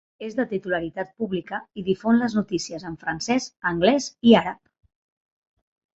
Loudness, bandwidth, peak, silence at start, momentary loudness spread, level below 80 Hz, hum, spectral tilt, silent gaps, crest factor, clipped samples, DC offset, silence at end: -24 LUFS; 8 kHz; -2 dBFS; 0.2 s; 14 LU; -58 dBFS; none; -5 dB/octave; none; 22 dB; under 0.1%; under 0.1%; 1.4 s